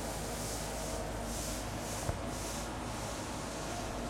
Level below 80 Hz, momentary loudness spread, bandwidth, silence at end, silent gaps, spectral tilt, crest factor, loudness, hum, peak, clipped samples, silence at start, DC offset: -46 dBFS; 2 LU; 16.5 kHz; 0 s; none; -4 dB/octave; 18 dB; -39 LUFS; none; -20 dBFS; under 0.1%; 0 s; under 0.1%